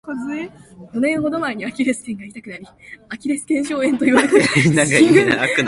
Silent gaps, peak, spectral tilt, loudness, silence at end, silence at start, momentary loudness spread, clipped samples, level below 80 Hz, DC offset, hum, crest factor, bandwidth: none; 0 dBFS; -5 dB/octave; -16 LUFS; 0 s; 0.05 s; 21 LU; under 0.1%; -54 dBFS; under 0.1%; none; 18 dB; 11.5 kHz